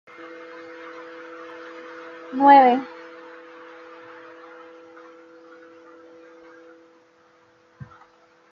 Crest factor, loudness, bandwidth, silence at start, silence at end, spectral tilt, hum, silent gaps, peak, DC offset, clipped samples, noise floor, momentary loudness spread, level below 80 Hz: 22 dB; -16 LUFS; 6.4 kHz; 2.3 s; 5.65 s; -2.5 dB/octave; none; none; -2 dBFS; under 0.1%; under 0.1%; -57 dBFS; 31 LU; -76 dBFS